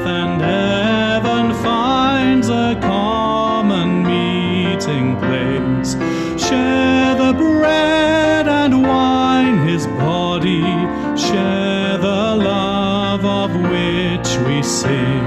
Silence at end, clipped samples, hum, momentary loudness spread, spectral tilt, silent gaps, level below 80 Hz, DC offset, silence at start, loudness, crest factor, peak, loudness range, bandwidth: 0 s; under 0.1%; none; 4 LU; -5.5 dB/octave; none; -40 dBFS; under 0.1%; 0 s; -15 LUFS; 10 dB; -4 dBFS; 3 LU; 13 kHz